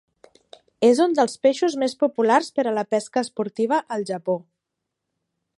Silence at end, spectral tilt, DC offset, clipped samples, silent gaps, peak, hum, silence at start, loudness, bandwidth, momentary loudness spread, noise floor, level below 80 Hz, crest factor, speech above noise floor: 1.15 s; -4.5 dB/octave; under 0.1%; under 0.1%; none; -4 dBFS; none; 0.8 s; -22 LUFS; 11.5 kHz; 9 LU; -82 dBFS; -76 dBFS; 18 dB; 61 dB